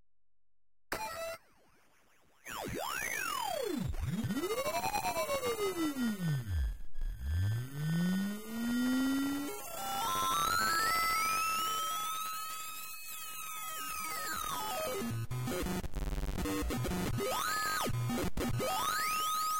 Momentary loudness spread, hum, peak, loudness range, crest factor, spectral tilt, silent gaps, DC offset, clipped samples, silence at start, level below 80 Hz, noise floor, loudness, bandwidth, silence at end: 10 LU; none; -24 dBFS; 6 LU; 12 dB; -4 dB/octave; none; 0.4%; under 0.1%; 0 s; -46 dBFS; under -90 dBFS; -35 LUFS; 16.5 kHz; 0 s